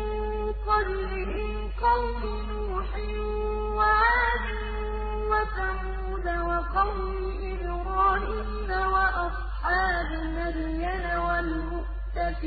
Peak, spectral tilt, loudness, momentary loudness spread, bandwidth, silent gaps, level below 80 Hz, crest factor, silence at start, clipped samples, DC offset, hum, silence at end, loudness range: -10 dBFS; -10 dB/octave; -28 LUFS; 9 LU; 4.8 kHz; none; -32 dBFS; 16 dB; 0 s; under 0.1%; under 0.1%; none; 0 s; 3 LU